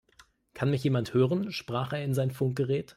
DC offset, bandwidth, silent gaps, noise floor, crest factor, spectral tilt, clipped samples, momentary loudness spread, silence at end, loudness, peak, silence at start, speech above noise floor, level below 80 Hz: under 0.1%; 14.5 kHz; none; -61 dBFS; 18 dB; -7.5 dB/octave; under 0.1%; 6 LU; 0.05 s; -29 LUFS; -12 dBFS; 0.55 s; 33 dB; -64 dBFS